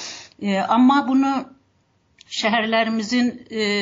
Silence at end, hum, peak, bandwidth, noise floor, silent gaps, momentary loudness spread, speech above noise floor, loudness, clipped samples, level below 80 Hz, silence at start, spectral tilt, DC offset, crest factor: 0 s; none; -6 dBFS; 7.8 kHz; -63 dBFS; none; 12 LU; 44 dB; -20 LUFS; under 0.1%; -66 dBFS; 0 s; -4.5 dB/octave; under 0.1%; 14 dB